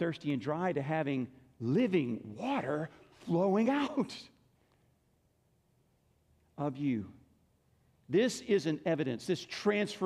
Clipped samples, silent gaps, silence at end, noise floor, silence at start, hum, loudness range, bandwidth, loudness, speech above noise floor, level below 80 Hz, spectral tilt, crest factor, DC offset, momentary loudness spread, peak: under 0.1%; none; 0 s; -73 dBFS; 0 s; none; 9 LU; 13 kHz; -33 LUFS; 40 dB; -74 dBFS; -6 dB/octave; 16 dB; under 0.1%; 10 LU; -18 dBFS